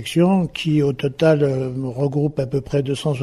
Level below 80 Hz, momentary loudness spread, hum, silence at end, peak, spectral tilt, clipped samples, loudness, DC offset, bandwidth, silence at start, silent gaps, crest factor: -48 dBFS; 7 LU; none; 0 s; -4 dBFS; -7 dB/octave; under 0.1%; -20 LUFS; under 0.1%; 12.5 kHz; 0 s; none; 16 dB